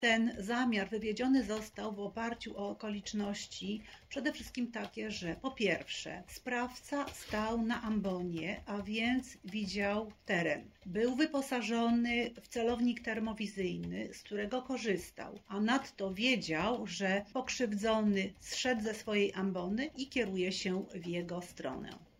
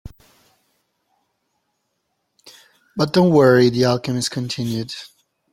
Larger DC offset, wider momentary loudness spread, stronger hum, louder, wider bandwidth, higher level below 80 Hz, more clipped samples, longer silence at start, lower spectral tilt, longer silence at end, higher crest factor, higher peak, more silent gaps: neither; second, 9 LU vs 17 LU; neither; second, -36 LUFS vs -17 LUFS; about the same, 16 kHz vs 15.5 kHz; second, -62 dBFS vs -54 dBFS; neither; about the same, 0 s vs 0.05 s; second, -4.5 dB/octave vs -6 dB/octave; second, 0.15 s vs 0.45 s; about the same, 18 dB vs 18 dB; second, -18 dBFS vs -2 dBFS; neither